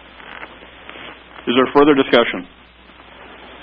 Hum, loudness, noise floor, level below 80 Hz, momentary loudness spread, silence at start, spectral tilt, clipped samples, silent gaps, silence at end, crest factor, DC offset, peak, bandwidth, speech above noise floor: none; -15 LUFS; -44 dBFS; -48 dBFS; 25 LU; 0.25 s; -7.5 dB/octave; under 0.1%; none; 1.2 s; 18 dB; under 0.1%; 0 dBFS; 5.2 kHz; 31 dB